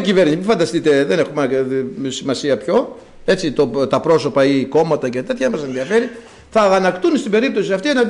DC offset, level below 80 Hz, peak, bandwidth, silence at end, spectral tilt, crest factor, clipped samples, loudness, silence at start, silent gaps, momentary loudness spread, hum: under 0.1%; -50 dBFS; -6 dBFS; 11 kHz; 0 s; -5.5 dB/octave; 10 dB; under 0.1%; -17 LUFS; 0 s; none; 7 LU; none